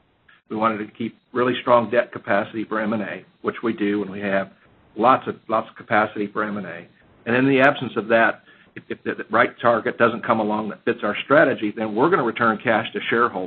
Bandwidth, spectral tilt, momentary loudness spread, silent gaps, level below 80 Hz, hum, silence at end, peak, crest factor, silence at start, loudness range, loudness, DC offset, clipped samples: 4.5 kHz; -8.5 dB/octave; 12 LU; none; -64 dBFS; none; 0 s; 0 dBFS; 22 dB; 0.5 s; 3 LU; -21 LUFS; under 0.1%; under 0.1%